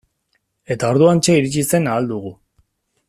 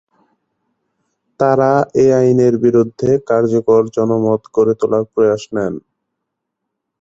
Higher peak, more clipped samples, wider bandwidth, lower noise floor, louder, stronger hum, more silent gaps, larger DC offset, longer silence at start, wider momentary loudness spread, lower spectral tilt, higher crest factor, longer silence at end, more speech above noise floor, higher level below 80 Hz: about the same, -2 dBFS vs -2 dBFS; neither; first, 14.5 kHz vs 7.8 kHz; second, -68 dBFS vs -77 dBFS; about the same, -16 LUFS vs -14 LUFS; neither; neither; neither; second, 0.7 s vs 1.4 s; first, 14 LU vs 7 LU; second, -5.5 dB/octave vs -8 dB/octave; about the same, 16 dB vs 14 dB; second, 0.75 s vs 1.2 s; second, 52 dB vs 63 dB; about the same, -54 dBFS vs -54 dBFS